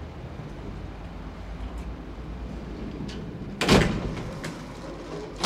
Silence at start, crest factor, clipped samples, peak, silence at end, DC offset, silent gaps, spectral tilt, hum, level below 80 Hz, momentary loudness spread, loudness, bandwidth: 0 s; 24 dB; under 0.1%; -6 dBFS; 0 s; under 0.1%; none; -5 dB/octave; none; -38 dBFS; 18 LU; -30 LUFS; 15.5 kHz